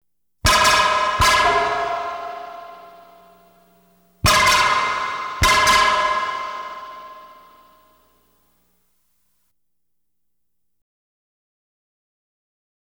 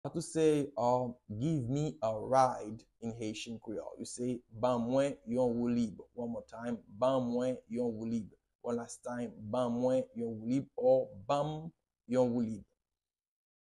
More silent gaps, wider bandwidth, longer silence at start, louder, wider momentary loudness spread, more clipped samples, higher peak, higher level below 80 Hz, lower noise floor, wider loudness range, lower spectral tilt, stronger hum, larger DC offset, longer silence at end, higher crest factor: second, none vs 8.55-8.59 s; first, over 20 kHz vs 12 kHz; first, 0.45 s vs 0.05 s; first, -17 LUFS vs -35 LUFS; first, 20 LU vs 12 LU; neither; first, -2 dBFS vs -14 dBFS; first, -38 dBFS vs -66 dBFS; second, -79 dBFS vs under -90 dBFS; first, 9 LU vs 3 LU; second, -2 dB/octave vs -6.5 dB/octave; neither; neither; first, 5.55 s vs 1.05 s; about the same, 20 dB vs 20 dB